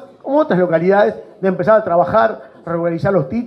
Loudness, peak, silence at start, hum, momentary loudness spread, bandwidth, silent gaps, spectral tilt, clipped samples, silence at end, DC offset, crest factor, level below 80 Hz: -15 LUFS; -2 dBFS; 0 s; none; 8 LU; 6 kHz; none; -9 dB/octave; under 0.1%; 0 s; under 0.1%; 14 dB; -52 dBFS